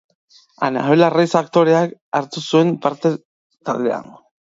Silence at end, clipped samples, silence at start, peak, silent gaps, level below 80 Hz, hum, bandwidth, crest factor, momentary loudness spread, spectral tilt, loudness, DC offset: 0.5 s; under 0.1%; 0.6 s; 0 dBFS; 2.01-2.12 s, 3.25-3.50 s; -68 dBFS; none; 7.8 kHz; 18 dB; 10 LU; -6.5 dB/octave; -18 LUFS; under 0.1%